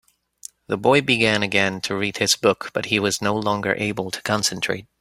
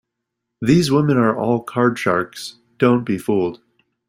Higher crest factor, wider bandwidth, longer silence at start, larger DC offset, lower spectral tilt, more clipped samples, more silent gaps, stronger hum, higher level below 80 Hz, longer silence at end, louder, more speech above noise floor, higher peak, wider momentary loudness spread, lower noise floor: about the same, 20 dB vs 16 dB; about the same, 16 kHz vs 16 kHz; about the same, 0.7 s vs 0.6 s; neither; second, -3.5 dB/octave vs -6.5 dB/octave; neither; neither; neither; about the same, -58 dBFS vs -54 dBFS; second, 0.2 s vs 0.55 s; about the same, -20 LUFS vs -18 LUFS; second, 23 dB vs 62 dB; about the same, -2 dBFS vs -2 dBFS; about the same, 9 LU vs 10 LU; second, -45 dBFS vs -79 dBFS